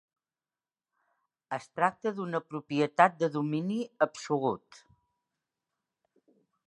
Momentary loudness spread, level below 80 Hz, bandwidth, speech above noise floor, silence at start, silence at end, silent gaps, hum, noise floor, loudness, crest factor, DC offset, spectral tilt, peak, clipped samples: 13 LU; -80 dBFS; 11 kHz; over 60 dB; 1.5 s; 2.1 s; none; none; under -90 dBFS; -30 LUFS; 26 dB; under 0.1%; -6 dB/octave; -6 dBFS; under 0.1%